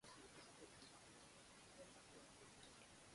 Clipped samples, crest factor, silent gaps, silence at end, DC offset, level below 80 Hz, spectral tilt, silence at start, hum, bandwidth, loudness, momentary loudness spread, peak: under 0.1%; 16 dB; none; 0 s; under 0.1%; -82 dBFS; -2.5 dB/octave; 0 s; none; 11.5 kHz; -63 LUFS; 2 LU; -48 dBFS